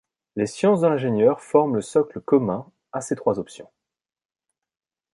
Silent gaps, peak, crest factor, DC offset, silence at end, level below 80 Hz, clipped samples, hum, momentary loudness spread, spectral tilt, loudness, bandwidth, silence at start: none; -4 dBFS; 20 dB; under 0.1%; 1.5 s; -64 dBFS; under 0.1%; none; 13 LU; -7 dB/octave; -22 LUFS; 11.5 kHz; 0.35 s